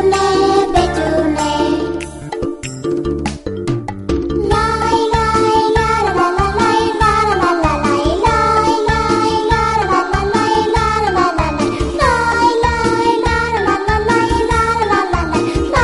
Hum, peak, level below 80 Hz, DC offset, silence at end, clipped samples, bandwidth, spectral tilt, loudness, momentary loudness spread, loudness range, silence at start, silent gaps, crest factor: none; 0 dBFS; -26 dBFS; under 0.1%; 0 s; under 0.1%; 11.5 kHz; -5.5 dB/octave; -14 LUFS; 8 LU; 5 LU; 0 s; none; 14 dB